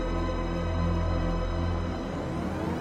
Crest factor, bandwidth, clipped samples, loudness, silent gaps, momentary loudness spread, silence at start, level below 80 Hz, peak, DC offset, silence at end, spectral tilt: 12 dB; 8.8 kHz; under 0.1%; -30 LUFS; none; 4 LU; 0 s; -34 dBFS; -16 dBFS; under 0.1%; 0 s; -7.5 dB/octave